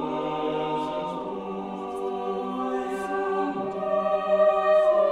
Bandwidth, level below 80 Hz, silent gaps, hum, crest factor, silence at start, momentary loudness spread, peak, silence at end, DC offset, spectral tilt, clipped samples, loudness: 11 kHz; -60 dBFS; none; none; 14 dB; 0 s; 12 LU; -10 dBFS; 0 s; under 0.1%; -6.5 dB/octave; under 0.1%; -26 LUFS